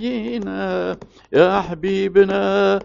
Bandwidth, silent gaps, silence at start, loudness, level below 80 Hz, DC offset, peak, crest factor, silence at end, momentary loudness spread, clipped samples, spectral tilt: 7.4 kHz; none; 0 s; -19 LUFS; -48 dBFS; under 0.1%; -2 dBFS; 16 dB; 0 s; 10 LU; under 0.1%; -4.5 dB/octave